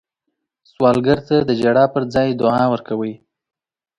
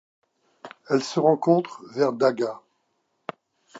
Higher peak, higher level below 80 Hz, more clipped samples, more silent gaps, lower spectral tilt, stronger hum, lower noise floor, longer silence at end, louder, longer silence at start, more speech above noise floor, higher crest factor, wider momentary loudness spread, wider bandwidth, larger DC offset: first, 0 dBFS vs -6 dBFS; first, -50 dBFS vs -78 dBFS; neither; neither; first, -7.5 dB/octave vs -6 dB/octave; neither; about the same, -76 dBFS vs -73 dBFS; first, 0.8 s vs 0 s; first, -17 LUFS vs -23 LUFS; first, 0.8 s vs 0.65 s; first, 60 dB vs 50 dB; about the same, 18 dB vs 20 dB; second, 9 LU vs 19 LU; first, 10.5 kHz vs 8 kHz; neither